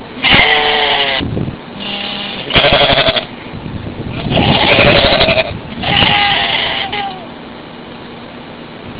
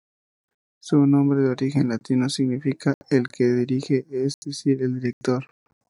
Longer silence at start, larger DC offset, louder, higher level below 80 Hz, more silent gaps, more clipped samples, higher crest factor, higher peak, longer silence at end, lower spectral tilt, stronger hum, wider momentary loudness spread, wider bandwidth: second, 0 s vs 0.85 s; neither; first, -10 LUFS vs -23 LUFS; first, -32 dBFS vs -70 dBFS; second, none vs 2.94-3.01 s, 4.34-4.42 s, 5.13-5.21 s; first, 0.4% vs under 0.1%; about the same, 14 dB vs 18 dB; first, 0 dBFS vs -6 dBFS; second, 0 s vs 0.5 s; about the same, -8 dB/octave vs -7 dB/octave; neither; first, 22 LU vs 8 LU; second, 4 kHz vs 11.5 kHz